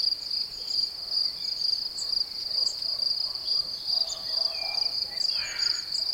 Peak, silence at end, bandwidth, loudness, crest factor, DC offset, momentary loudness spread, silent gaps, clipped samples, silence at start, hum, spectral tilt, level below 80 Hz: -14 dBFS; 0 s; 16.5 kHz; -26 LUFS; 16 dB; under 0.1%; 2 LU; none; under 0.1%; 0 s; none; 1 dB/octave; -62 dBFS